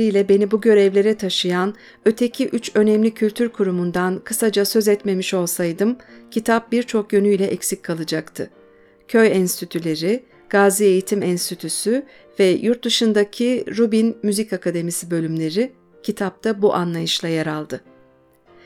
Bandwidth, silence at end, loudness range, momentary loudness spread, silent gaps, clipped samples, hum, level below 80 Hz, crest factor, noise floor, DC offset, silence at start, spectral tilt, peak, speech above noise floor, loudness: 17 kHz; 0.85 s; 3 LU; 9 LU; none; under 0.1%; none; -62 dBFS; 16 dB; -53 dBFS; under 0.1%; 0 s; -4.5 dB/octave; -2 dBFS; 35 dB; -19 LUFS